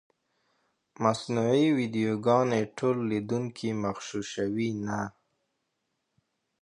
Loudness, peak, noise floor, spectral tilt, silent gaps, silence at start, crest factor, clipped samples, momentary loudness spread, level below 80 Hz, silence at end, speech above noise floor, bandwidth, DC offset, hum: -28 LUFS; -10 dBFS; -80 dBFS; -6 dB/octave; none; 1 s; 20 dB; under 0.1%; 9 LU; -66 dBFS; 1.5 s; 52 dB; 10.5 kHz; under 0.1%; none